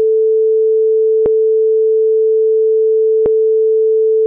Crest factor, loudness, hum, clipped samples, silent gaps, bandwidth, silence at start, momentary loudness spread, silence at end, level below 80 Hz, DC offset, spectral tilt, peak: 4 dB; -12 LUFS; none; under 0.1%; none; 1.2 kHz; 0 s; 0 LU; 0 s; -54 dBFS; under 0.1%; -11.5 dB/octave; -8 dBFS